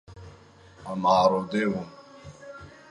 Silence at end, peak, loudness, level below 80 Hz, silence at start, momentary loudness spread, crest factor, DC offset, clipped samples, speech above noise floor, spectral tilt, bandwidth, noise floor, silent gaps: 0.2 s; -8 dBFS; -24 LUFS; -58 dBFS; 0.1 s; 26 LU; 20 dB; under 0.1%; under 0.1%; 28 dB; -6 dB/octave; 11 kHz; -52 dBFS; none